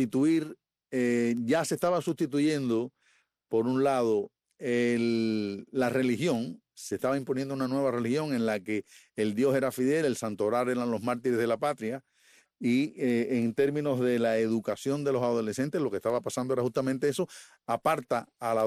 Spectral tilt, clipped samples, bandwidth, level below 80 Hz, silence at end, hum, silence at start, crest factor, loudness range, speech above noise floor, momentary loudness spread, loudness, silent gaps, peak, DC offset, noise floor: -6 dB/octave; under 0.1%; 14.5 kHz; -70 dBFS; 0 s; none; 0 s; 16 dB; 2 LU; 41 dB; 8 LU; -29 LUFS; none; -14 dBFS; under 0.1%; -69 dBFS